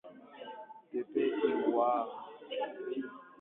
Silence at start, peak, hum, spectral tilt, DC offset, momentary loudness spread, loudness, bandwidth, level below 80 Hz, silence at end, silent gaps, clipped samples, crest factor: 0.05 s; -18 dBFS; none; -8 dB/octave; under 0.1%; 18 LU; -34 LUFS; 4 kHz; -86 dBFS; 0.1 s; none; under 0.1%; 18 dB